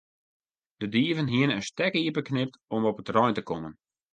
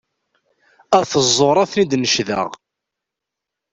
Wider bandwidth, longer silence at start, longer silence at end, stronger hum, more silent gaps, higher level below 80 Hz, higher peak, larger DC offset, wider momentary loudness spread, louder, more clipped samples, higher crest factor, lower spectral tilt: first, 9.2 kHz vs 8.2 kHz; about the same, 0.8 s vs 0.9 s; second, 0.4 s vs 1.15 s; neither; first, 2.64-2.68 s vs none; second, -64 dBFS vs -58 dBFS; second, -8 dBFS vs -2 dBFS; neither; about the same, 10 LU vs 8 LU; second, -27 LUFS vs -16 LUFS; neither; about the same, 20 dB vs 18 dB; first, -6 dB/octave vs -3.5 dB/octave